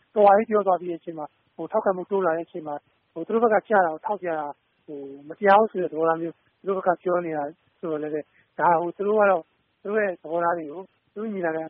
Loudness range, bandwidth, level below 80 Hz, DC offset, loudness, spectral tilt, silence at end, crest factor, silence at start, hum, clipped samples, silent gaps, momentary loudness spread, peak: 2 LU; 4.3 kHz; -74 dBFS; under 0.1%; -24 LUFS; -5 dB/octave; 0 s; 20 dB; 0.15 s; none; under 0.1%; none; 19 LU; -6 dBFS